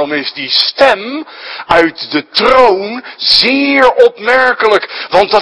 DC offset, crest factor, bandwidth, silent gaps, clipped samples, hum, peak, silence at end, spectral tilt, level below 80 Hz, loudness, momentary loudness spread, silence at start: under 0.1%; 10 dB; 11 kHz; none; 2%; none; 0 dBFS; 0 s; -3.5 dB/octave; -44 dBFS; -9 LUFS; 10 LU; 0 s